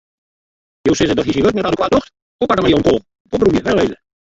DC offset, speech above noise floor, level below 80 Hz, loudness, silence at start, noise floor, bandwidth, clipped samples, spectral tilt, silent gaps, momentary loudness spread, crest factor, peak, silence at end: under 0.1%; over 76 dB; -38 dBFS; -16 LUFS; 0.85 s; under -90 dBFS; 7.8 kHz; under 0.1%; -5.5 dB/octave; 2.22-2.39 s, 3.20-3.25 s; 7 LU; 16 dB; 0 dBFS; 0.4 s